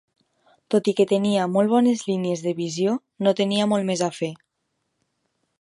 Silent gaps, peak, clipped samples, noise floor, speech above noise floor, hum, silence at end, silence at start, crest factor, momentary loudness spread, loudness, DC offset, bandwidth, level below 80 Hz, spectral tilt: none; -6 dBFS; under 0.1%; -76 dBFS; 54 dB; none; 1.25 s; 0.7 s; 18 dB; 6 LU; -22 LUFS; under 0.1%; 11.5 kHz; -72 dBFS; -5.5 dB/octave